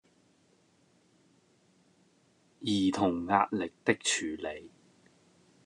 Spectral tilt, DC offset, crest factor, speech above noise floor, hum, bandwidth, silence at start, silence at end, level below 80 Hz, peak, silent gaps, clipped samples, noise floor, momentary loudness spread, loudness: -3.5 dB/octave; under 0.1%; 24 dB; 37 dB; none; 11 kHz; 2.6 s; 0.95 s; -70 dBFS; -10 dBFS; none; under 0.1%; -68 dBFS; 12 LU; -30 LUFS